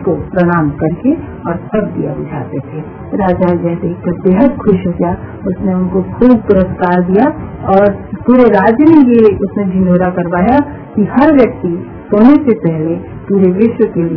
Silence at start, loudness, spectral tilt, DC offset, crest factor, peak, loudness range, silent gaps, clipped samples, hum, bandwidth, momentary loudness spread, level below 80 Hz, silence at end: 0 s; -11 LUFS; -11.5 dB/octave; under 0.1%; 10 dB; 0 dBFS; 6 LU; none; 1%; none; 5.4 kHz; 13 LU; -34 dBFS; 0 s